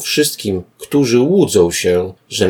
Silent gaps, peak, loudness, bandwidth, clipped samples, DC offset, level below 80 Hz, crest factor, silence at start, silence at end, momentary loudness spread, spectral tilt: none; 0 dBFS; -15 LUFS; 19 kHz; under 0.1%; under 0.1%; -48 dBFS; 14 dB; 0 s; 0 s; 10 LU; -4.5 dB/octave